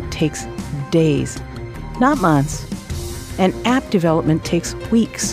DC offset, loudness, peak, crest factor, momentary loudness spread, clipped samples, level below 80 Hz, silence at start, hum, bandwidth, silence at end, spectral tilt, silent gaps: under 0.1%; -19 LUFS; -2 dBFS; 16 dB; 12 LU; under 0.1%; -36 dBFS; 0 s; none; 15.5 kHz; 0 s; -5.5 dB/octave; none